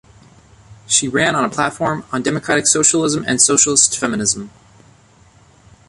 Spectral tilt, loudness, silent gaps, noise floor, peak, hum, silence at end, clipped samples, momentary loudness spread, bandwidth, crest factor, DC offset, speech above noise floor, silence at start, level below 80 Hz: -2 dB/octave; -15 LUFS; none; -49 dBFS; 0 dBFS; none; 1.4 s; under 0.1%; 9 LU; 11.5 kHz; 18 dB; under 0.1%; 33 dB; 0.7 s; -52 dBFS